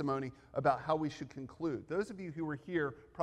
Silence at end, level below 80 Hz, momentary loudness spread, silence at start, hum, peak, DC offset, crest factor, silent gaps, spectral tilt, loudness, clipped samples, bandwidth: 0 s; -68 dBFS; 8 LU; 0 s; none; -18 dBFS; under 0.1%; 20 dB; none; -7 dB/octave; -37 LUFS; under 0.1%; 10.5 kHz